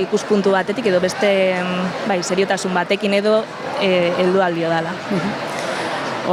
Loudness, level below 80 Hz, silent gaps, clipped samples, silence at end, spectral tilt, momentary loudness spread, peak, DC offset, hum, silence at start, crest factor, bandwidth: -18 LUFS; -62 dBFS; none; under 0.1%; 0 s; -5 dB/octave; 6 LU; -4 dBFS; under 0.1%; none; 0 s; 14 dB; 13.5 kHz